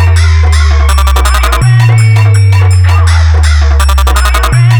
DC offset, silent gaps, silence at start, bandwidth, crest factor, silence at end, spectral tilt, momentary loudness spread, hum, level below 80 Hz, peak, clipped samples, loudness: under 0.1%; none; 0 s; 19.5 kHz; 4 dB; 0 s; -5 dB/octave; 2 LU; none; -8 dBFS; 0 dBFS; under 0.1%; -7 LUFS